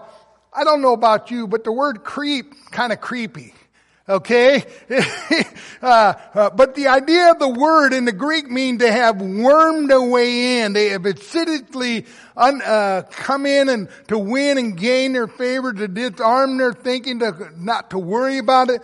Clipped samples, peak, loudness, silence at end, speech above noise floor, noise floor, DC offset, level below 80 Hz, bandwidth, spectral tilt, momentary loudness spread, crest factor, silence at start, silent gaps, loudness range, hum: under 0.1%; -2 dBFS; -17 LUFS; 0.05 s; 30 dB; -47 dBFS; under 0.1%; -62 dBFS; 11.5 kHz; -4.5 dB/octave; 10 LU; 16 dB; 0.55 s; none; 5 LU; none